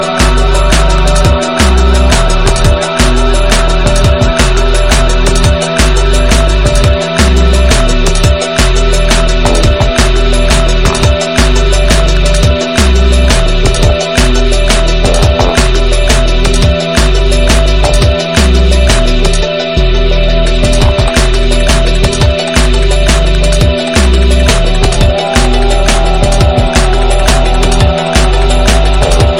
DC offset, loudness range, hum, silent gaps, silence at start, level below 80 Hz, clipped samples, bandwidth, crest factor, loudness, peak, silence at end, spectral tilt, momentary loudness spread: 2%; 1 LU; none; none; 0 s; -8 dBFS; 0.8%; 14 kHz; 6 dB; -9 LUFS; 0 dBFS; 0 s; -4.5 dB/octave; 2 LU